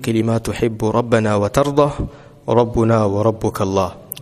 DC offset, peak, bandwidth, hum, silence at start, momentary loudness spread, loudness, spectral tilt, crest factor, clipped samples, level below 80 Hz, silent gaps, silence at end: under 0.1%; 0 dBFS; 15.5 kHz; none; 0 s; 6 LU; -17 LUFS; -7 dB/octave; 18 dB; under 0.1%; -38 dBFS; none; 0 s